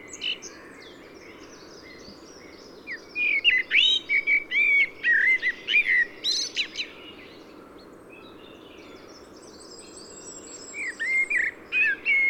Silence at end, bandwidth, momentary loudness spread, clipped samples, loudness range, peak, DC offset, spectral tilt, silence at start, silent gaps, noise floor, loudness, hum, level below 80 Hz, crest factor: 0 s; 17 kHz; 25 LU; under 0.1%; 18 LU; -10 dBFS; under 0.1%; 0.5 dB/octave; 0 s; none; -47 dBFS; -22 LUFS; none; -64 dBFS; 18 dB